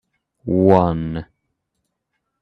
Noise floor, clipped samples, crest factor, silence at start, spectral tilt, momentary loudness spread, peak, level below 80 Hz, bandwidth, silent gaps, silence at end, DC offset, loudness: -75 dBFS; under 0.1%; 20 dB; 0.45 s; -10 dB/octave; 17 LU; 0 dBFS; -46 dBFS; 5.6 kHz; none; 1.2 s; under 0.1%; -17 LUFS